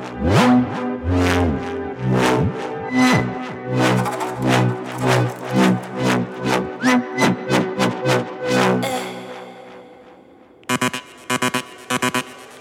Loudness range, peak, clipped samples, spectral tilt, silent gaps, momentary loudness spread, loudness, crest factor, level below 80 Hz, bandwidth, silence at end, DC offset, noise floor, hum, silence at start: 5 LU; -2 dBFS; under 0.1%; -5.5 dB/octave; none; 10 LU; -19 LUFS; 18 dB; -42 dBFS; 17 kHz; 0 s; under 0.1%; -47 dBFS; none; 0 s